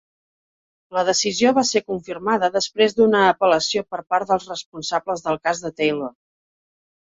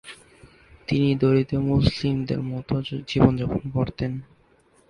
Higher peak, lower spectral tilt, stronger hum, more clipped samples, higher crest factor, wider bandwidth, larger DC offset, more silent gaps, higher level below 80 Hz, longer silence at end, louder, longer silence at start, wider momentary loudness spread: about the same, -2 dBFS vs 0 dBFS; second, -3 dB/octave vs -8 dB/octave; neither; neither; second, 18 dB vs 24 dB; second, 7.8 kHz vs 10.5 kHz; neither; first, 4.66-4.72 s vs none; second, -60 dBFS vs -42 dBFS; first, 0.95 s vs 0.65 s; first, -20 LUFS vs -23 LUFS; first, 0.9 s vs 0.05 s; about the same, 11 LU vs 10 LU